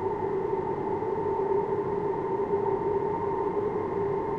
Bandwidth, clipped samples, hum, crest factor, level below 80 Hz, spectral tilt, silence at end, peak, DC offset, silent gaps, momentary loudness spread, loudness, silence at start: 5.2 kHz; under 0.1%; none; 12 dB; -54 dBFS; -9.5 dB/octave; 0 s; -16 dBFS; under 0.1%; none; 2 LU; -29 LUFS; 0 s